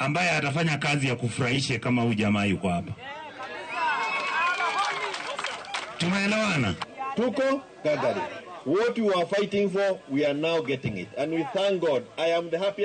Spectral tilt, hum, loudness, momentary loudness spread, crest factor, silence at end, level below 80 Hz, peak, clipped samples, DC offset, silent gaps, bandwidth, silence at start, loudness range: -5 dB/octave; none; -26 LUFS; 9 LU; 12 dB; 0 s; -62 dBFS; -16 dBFS; under 0.1%; under 0.1%; none; 9.4 kHz; 0 s; 1 LU